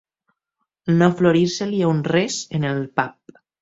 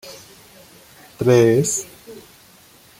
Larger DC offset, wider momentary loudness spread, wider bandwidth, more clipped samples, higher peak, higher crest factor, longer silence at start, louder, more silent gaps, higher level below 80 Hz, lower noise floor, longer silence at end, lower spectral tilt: neither; second, 8 LU vs 27 LU; second, 7.8 kHz vs 16.5 kHz; neither; about the same, -2 dBFS vs -2 dBFS; about the same, 20 dB vs 18 dB; first, 0.85 s vs 0.05 s; second, -20 LUFS vs -17 LUFS; neither; about the same, -58 dBFS vs -58 dBFS; first, -78 dBFS vs -49 dBFS; second, 0.5 s vs 0.8 s; about the same, -6 dB/octave vs -5.5 dB/octave